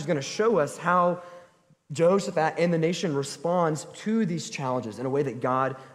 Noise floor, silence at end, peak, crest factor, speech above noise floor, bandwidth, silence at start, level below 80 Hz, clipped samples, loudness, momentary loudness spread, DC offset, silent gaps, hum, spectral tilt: -58 dBFS; 0 s; -8 dBFS; 18 dB; 32 dB; 13.5 kHz; 0 s; -70 dBFS; under 0.1%; -26 LUFS; 7 LU; under 0.1%; none; none; -5.5 dB/octave